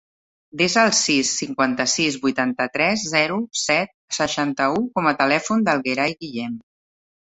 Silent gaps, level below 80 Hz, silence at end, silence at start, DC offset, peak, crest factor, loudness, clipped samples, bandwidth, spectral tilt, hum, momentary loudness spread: 3.94-4.08 s; -60 dBFS; 0.65 s; 0.55 s; under 0.1%; -2 dBFS; 20 dB; -20 LUFS; under 0.1%; 8.4 kHz; -3 dB/octave; none; 9 LU